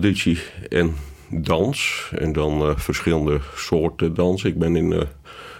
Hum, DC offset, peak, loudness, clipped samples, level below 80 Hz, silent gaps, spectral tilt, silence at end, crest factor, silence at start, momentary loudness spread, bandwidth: none; under 0.1%; -4 dBFS; -22 LUFS; under 0.1%; -34 dBFS; none; -6 dB/octave; 0 s; 18 dB; 0 s; 6 LU; 16.5 kHz